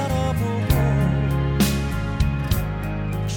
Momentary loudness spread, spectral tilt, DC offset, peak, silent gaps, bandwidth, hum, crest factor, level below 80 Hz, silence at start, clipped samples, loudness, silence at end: 6 LU; -6.5 dB/octave; under 0.1%; -4 dBFS; none; 18 kHz; none; 16 dB; -28 dBFS; 0 s; under 0.1%; -22 LUFS; 0 s